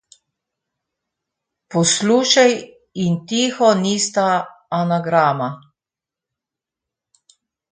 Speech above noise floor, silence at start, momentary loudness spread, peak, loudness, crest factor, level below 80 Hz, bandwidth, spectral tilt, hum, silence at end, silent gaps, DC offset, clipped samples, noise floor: 71 dB; 1.7 s; 11 LU; 0 dBFS; -17 LUFS; 20 dB; -64 dBFS; 9.6 kHz; -4 dB/octave; none; 2.15 s; none; under 0.1%; under 0.1%; -88 dBFS